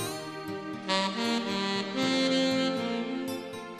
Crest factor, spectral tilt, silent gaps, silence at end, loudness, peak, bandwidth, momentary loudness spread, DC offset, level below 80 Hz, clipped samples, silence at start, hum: 18 dB; -4 dB/octave; none; 0 s; -29 LUFS; -12 dBFS; 14 kHz; 11 LU; under 0.1%; -74 dBFS; under 0.1%; 0 s; none